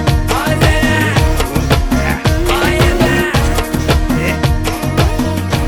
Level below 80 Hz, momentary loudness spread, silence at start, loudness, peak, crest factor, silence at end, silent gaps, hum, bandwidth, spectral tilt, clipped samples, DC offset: -18 dBFS; 4 LU; 0 s; -13 LUFS; 0 dBFS; 12 dB; 0 s; none; none; over 20 kHz; -5.5 dB/octave; under 0.1%; under 0.1%